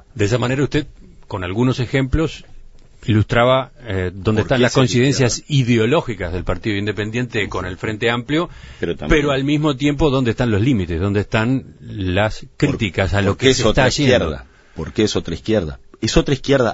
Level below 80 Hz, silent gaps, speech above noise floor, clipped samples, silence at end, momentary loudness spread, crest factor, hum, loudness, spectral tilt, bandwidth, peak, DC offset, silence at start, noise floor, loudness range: -32 dBFS; none; 22 dB; under 0.1%; 0 s; 10 LU; 18 dB; none; -18 LUFS; -5.5 dB/octave; 8 kHz; 0 dBFS; under 0.1%; 0.15 s; -39 dBFS; 3 LU